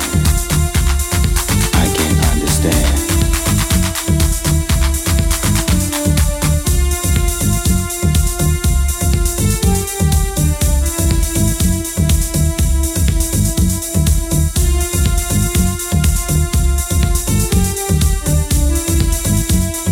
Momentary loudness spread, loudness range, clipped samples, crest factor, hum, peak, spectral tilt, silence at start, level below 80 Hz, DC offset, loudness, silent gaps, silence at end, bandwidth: 2 LU; 1 LU; under 0.1%; 14 dB; none; 0 dBFS; -4.5 dB/octave; 0 s; -16 dBFS; under 0.1%; -15 LUFS; none; 0 s; 17 kHz